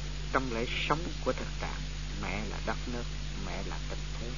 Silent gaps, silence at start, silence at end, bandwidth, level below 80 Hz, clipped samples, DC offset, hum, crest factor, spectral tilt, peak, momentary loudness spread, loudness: none; 0 s; 0 s; 7.2 kHz; -38 dBFS; under 0.1%; 0.7%; 50 Hz at -40 dBFS; 24 dB; -3.5 dB/octave; -12 dBFS; 7 LU; -35 LUFS